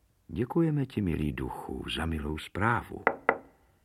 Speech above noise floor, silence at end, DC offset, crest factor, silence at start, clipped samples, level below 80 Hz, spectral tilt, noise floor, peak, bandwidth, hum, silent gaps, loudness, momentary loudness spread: 19 dB; 0.4 s; under 0.1%; 26 dB; 0.3 s; under 0.1%; -46 dBFS; -7 dB/octave; -50 dBFS; -6 dBFS; 15 kHz; none; none; -31 LUFS; 9 LU